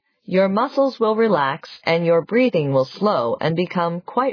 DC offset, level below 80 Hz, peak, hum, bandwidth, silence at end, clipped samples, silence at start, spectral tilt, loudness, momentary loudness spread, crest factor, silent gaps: under 0.1%; -68 dBFS; -4 dBFS; none; 5.4 kHz; 0 s; under 0.1%; 0.3 s; -8 dB/octave; -19 LUFS; 5 LU; 14 dB; none